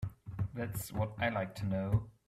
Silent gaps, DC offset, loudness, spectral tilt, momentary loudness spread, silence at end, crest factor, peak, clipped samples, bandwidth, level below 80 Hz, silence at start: none; under 0.1%; -37 LUFS; -6.5 dB/octave; 7 LU; 0.2 s; 18 dB; -18 dBFS; under 0.1%; 16 kHz; -54 dBFS; 0 s